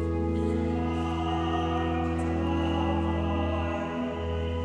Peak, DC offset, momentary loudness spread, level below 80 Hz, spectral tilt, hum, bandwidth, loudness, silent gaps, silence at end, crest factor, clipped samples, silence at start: -14 dBFS; under 0.1%; 4 LU; -36 dBFS; -7.5 dB/octave; none; 9 kHz; -29 LUFS; none; 0 s; 14 dB; under 0.1%; 0 s